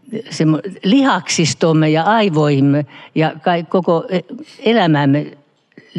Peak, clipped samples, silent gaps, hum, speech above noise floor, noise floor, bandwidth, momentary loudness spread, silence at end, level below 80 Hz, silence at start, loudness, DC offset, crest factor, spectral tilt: -2 dBFS; under 0.1%; none; none; 32 dB; -47 dBFS; 11 kHz; 9 LU; 0 s; -70 dBFS; 0.1 s; -15 LUFS; under 0.1%; 14 dB; -5.5 dB/octave